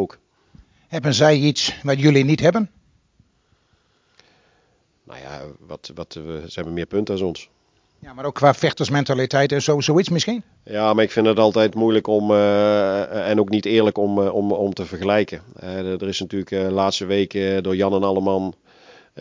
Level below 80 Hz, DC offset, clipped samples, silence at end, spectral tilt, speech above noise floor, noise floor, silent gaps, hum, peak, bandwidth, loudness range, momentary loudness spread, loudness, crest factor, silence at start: -52 dBFS; under 0.1%; under 0.1%; 0 s; -5.5 dB/octave; 44 dB; -63 dBFS; none; none; 0 dBFS; 7.6 kHz; 11 LU; 16 LU; -19 LUFS; 20 dB; 0 s